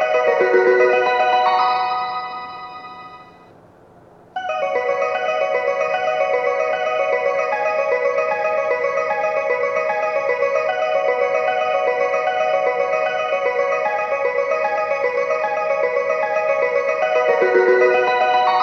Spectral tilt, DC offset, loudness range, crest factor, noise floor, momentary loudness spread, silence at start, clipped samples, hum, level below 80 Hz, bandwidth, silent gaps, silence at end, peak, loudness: -4 dB/octave; under 0.1%; 5 LU; 14 dB; -47 dBFS; 6 LU; 0 s; under 0.1%; none; -66 dBFS; 7.2 kHz; none; 0 s; -4 dBFS; -18 LUFS